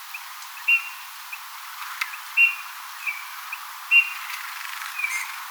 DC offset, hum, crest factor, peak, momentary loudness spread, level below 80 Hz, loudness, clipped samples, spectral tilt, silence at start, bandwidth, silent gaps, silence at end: under 0.1%; none; 20 dB; -6 dBFS; 18 LU; under -90 dBFS; -23 LUFS; under 0.1%; 11.5 dB/octave; 0 s; over 20 kHz; none; 0 s